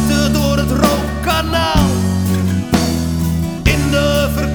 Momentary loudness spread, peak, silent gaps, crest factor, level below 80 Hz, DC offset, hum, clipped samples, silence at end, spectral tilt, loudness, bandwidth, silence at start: 4 LU; 0 dBFS; none; 14 dB; -24 dBFS; under 0.1%; none; under 0.1%; 0 s; -5.5 dB/octave; -15 LUFS; over 20 kHz; 0 s